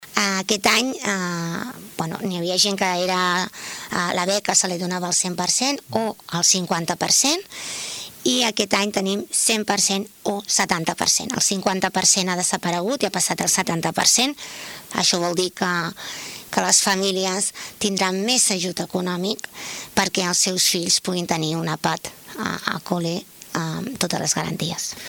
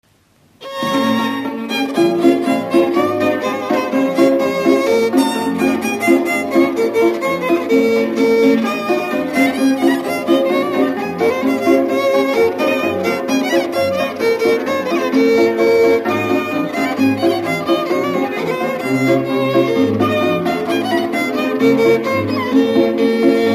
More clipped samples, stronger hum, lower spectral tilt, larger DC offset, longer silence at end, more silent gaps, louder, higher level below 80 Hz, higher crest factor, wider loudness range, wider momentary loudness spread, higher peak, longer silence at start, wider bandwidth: neither; neither; second, -2 dB/octave vs -5.5 dB/octave; neither; about the same, 0 s vs 0 s; neither; second, -20 LUFS vs -15 LUFS; about the same, -60 dBFS vs -60 dBFS; first, 20 dB vs 14 dB; about the same, 3 LU vs 1 LU; first, 12 LU vs 5 LU; about the same, -2 dBFS vs 0 dBFS; second, 0 s vs 0.6 s; first, over 20 kHz vs 15 kHz